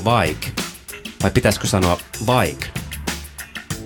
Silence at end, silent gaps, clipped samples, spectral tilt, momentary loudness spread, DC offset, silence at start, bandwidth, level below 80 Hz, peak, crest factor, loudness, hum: 0 s; none; under 0.1%; -4.5 dB/octave; 14 LU; under 0.1%; 0 s; 20 kHz; -38 dBFS; -2 dBFS; 18 dB; -21 LUFS; none